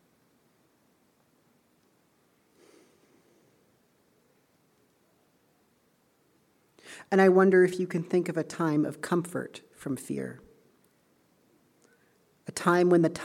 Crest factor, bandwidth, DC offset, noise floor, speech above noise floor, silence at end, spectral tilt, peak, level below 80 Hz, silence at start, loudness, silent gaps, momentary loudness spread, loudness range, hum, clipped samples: 22 dB; 14 kHz; under 0.1%; -68 dBFS; 43 dB; 0 s; -6.5 dB/octave; -8 dBFS; -76 dBFS; 6.85 s; -26 LUFS; none; 21 LU; 11 LU; none; under 0.1%